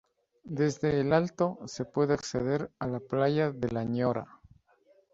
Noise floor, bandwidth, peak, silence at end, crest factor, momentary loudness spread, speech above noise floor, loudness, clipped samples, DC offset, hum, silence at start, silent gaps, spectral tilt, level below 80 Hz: -65 dBFS; 8 kHz; -10 dBFS; 0.9 s; 20 dB; 9 LU; 36 dB; -30 LUFS; under 0.1%; under 0.1%; none; 0.45 s; none; -6.5 dB/octave; -60 dBFS